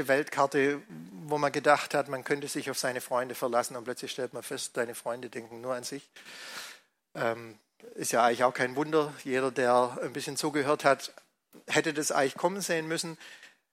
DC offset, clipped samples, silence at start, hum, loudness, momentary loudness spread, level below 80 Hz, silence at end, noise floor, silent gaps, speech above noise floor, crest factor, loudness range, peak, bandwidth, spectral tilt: under 0.1%; under 0.1%; 0 s; none; -30 LUFS; 16 LU; -80 dBFS; 0.25 s; -52 dBFS; none; 22 dB; 22 dB; 8 LU; -8 dBFS; 16 kHz; -3.5 dB/octave